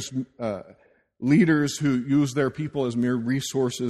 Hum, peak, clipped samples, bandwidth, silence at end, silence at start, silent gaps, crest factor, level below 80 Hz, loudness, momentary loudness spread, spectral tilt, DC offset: none; -8 dBFS; under 0.1%; 13.5 kHz; 0 s; 0 s; none; 16 dB; -60 dBFS; -24 LUFS; 12 LU; -6 dB/octave; under 0.1%